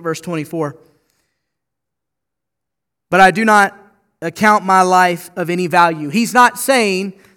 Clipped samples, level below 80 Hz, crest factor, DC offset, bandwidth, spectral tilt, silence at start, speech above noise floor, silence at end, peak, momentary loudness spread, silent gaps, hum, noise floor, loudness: 0.1%; -56 dBFS; 16 dB; under 0.1%; 19.5 kHz; -4 dB/octave; 0 s; 68 dB; 0.25 s; 0 dBFS; 12 LU; none; none; -82 dBFS; -13 LUFS